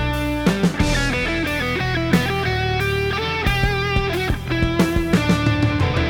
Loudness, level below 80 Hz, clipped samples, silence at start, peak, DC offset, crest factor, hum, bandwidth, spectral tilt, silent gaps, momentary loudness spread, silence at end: -20 LUFS; -30 dBFS; under 0.1%; 0 s; -4 dBFS; under 0.1%; 16 dB; none; over 20 kHz; -5.5 dB/octave; none; 3 LU; 0 s